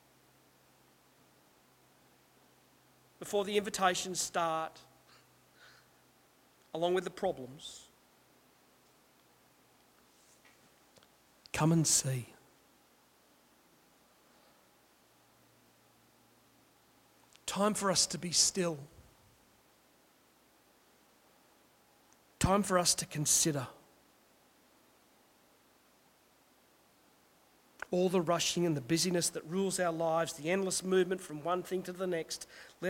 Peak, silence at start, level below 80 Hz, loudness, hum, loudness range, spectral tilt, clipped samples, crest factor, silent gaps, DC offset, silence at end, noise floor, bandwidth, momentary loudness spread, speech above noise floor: -14 dBFS; 3.2 s; -64 dBFS; -32 LUFS; none; 9 LU; -3.5 dB/octave; under 0.1%; 24 dB; none; under 0.1%; 0 s; -67 dBFS; 16.5 kHz; 16 LU; 34 dB